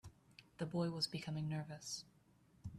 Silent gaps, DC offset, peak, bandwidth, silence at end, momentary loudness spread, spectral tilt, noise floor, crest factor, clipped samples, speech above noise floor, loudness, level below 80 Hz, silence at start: none; under 0.1%; -26 dBFS; 13.5 kHz; 0 s; 22 LU; -5 dB/octave; -71 dBFS; 18 dB; under 0.1%; 28 dB; -43 LUFS; -70 dBFS; 0.05 s